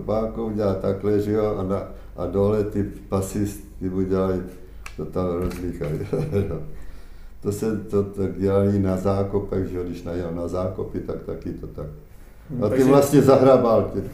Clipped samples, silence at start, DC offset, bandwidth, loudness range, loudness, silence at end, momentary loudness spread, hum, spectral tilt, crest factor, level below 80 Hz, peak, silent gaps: under 0.1%; 0 s; under 0.1%; 15.5 kHz; 8 LU; -23 LUFS; 0 s; 16 LU; none; -7.5 dB/octave; 20 dB; -40 dBFS; -2 dBFS; none